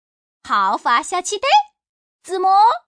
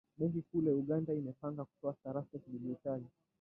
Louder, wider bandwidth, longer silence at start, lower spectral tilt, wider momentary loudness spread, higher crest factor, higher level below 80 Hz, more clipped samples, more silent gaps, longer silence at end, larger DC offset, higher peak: first, -17 LUFS vs -39 LUFS; first, 10.5 kHz vs 2.9 kHz; first, 0.45 s vs 0.2 s; second, -0.5 dB/octave vs -12.5 dB/octave; about the same, 10 LU vs 10 LU; about the same, 14 dB vs 16 dB; first, -66 dBFS vs -74 dBFS; neither; first, 1.89-2.19 s vs none; second, 0.1 s vs 0.35 s; neither; first, -4 dBFS vs -22 dBFS